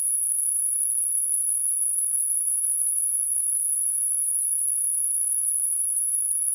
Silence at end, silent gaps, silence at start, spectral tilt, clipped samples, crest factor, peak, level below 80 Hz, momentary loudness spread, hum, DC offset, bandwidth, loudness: 0 s; none; 0 s; 8 dB/octave; under 0.1%; 14 dB; -10 dBFS; under -90 dBFS; 0 LU; none; under 0.1%; 11.5 kHz; -20 LUFS